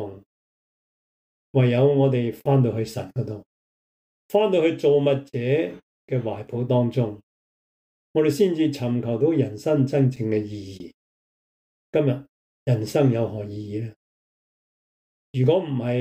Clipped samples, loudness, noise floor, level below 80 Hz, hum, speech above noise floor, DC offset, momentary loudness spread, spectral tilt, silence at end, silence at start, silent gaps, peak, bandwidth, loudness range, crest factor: under 0.1%; -23 LUFS; under -90 dBFS; -64 dBFS; none; over 68 dB; under 0.1%; 13 LU; -8 dB/octave; 0 s; 0 s; 0.26-1.54 s, 3.46-4.29 s, 5.83-6.08 s, 7.23-8.14 s, 10.94-11.93 s, 12.29-12.66 s, 13.96-15.33 s; -6 dBFS; 15.5 kHz; 3 LU; 16 dB